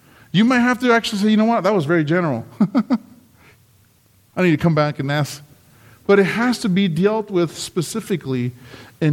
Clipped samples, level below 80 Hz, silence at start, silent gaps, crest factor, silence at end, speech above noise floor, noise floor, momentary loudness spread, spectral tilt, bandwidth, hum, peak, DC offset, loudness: under 0.1%; -58 dBFS; 0.35 s; none; 16 dB; 0 s; 38 dB; -55 dBFS; 9 LU; -6 dB/octave; 16.5 kHz; none; -4 dBFS; under 0.1%; -18 LUFS